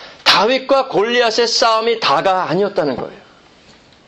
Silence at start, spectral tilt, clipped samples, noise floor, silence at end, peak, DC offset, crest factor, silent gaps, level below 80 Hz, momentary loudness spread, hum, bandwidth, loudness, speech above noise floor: 0 s; -3 dB/octave; under 0.1%; -46 dBFS; 0.9 s; 0 dBFS; under 0.1%; 16 dB; none; -56 dBFS; 8 LU; none; 15.5 kHz; -14 LUFS; 31 dB